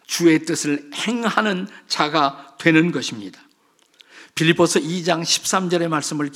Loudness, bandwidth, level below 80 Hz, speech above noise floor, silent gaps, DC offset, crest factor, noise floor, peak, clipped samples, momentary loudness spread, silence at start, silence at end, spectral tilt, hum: -19 LUFS; 16 kHz; -72 dBFS; 40 dB; none; under 0.1%; 20 dB; -59 dBFS; 0 dBFS; under 0.1%; 10 LU; 0.1 s; 0 s; -4 dB/octave; none